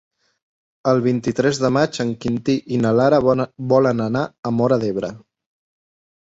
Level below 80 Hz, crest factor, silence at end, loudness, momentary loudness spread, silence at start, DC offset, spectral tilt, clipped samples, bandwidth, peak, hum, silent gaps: -54 dBFS; 16 dB; 1 s; -19 LUFS; 8 LU; 0.85 s; under 0.1%; -6.5 dB/octave; under 0.1%; 8 kHz; -2 dBFS; none; 4.39-4.43 s